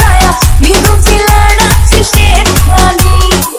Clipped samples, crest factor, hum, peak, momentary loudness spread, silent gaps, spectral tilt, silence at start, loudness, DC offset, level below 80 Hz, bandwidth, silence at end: 7%; 6 dB; none; 0 dBFS; 1 LU; none; -4 dB/octave; 0 s; -7 LUFS; under 0.1%; -8 dBFS; over 20 kHz; 0 s